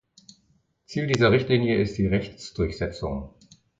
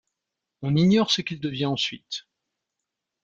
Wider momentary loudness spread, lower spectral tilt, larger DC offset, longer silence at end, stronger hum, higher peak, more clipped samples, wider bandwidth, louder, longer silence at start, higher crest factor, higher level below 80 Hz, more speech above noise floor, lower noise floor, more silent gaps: about the same, 15 LU vs 15 LU; about the same, -6.5 dB/octave vs -5.5 dB/octave; neither; second, 0.5 s vs 1.05 s; neither; about the same, -6 dBFS vs -8 dBFS; neither; about the same, 7.8 kHz vs 7.8 kHz; about the same, -24 LUFS vs -23 LUFS; first, 0.9 s vs 0.6 s; about the same, 18 dB vs 18 dB; first, -42 dBFS vs -62 dBFS; second, 43 dB vs 61 dB; second, -66 dBFS vs -85 dBFS; neither